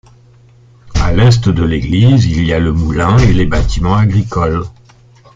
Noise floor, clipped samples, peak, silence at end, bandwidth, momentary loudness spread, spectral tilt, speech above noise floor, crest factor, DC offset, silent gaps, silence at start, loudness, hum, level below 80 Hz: -43 dBFS; under 0.1%; 0 dBFS; 0.65 s; 7.6 kHz; 7 LU; -7 dB/octave; 33 dB; 10 dB; under 0.1%; none; 0.85 s; -12 LUFS; none; -22 dBFS